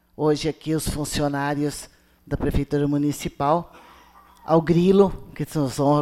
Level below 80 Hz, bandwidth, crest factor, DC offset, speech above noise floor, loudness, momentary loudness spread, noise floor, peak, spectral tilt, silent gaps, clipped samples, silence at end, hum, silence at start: -40 dBFS; 16 kHz; 18 dB; under 0.1%; 29 dB; -23 LUFS; 11 LU; -51 dBFS; -4 dBFS; -6.5 dB/octave; none; under 0.1%; 0 s; none; 0.2 s